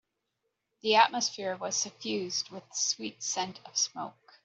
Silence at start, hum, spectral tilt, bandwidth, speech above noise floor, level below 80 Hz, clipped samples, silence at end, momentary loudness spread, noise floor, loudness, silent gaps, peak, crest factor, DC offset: 0.85 s; none; -1 dB/octave; 8.2 kHz; 51 dB; -82 dBFS; under 0.1%; 0.35 s; 12 LU; -82 dBFS; -30 LUFS; none; -8 dBFS; 24 dB; under 0.1%